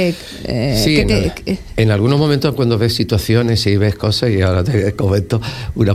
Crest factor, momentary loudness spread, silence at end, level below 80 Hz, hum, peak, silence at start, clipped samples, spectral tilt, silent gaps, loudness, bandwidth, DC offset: 14 dB; 7 LU; 0 s; -30 dBFS; none; 0 dBFS; 0 s; under 0.1%; -6 dB/octave; none; -15 LUFS; 15 kHz; under 0.1%